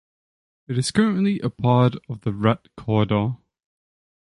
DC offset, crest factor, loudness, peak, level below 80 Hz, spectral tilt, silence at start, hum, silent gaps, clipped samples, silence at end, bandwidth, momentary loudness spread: under 0.1%; 18 dB; -22 LUFS; -4 dBFS; -52 dBFS; -6.5 dB/octave; 0.7 s; none; none; under 0.1%; 0.9 s; 11.5 kHz; 10 LU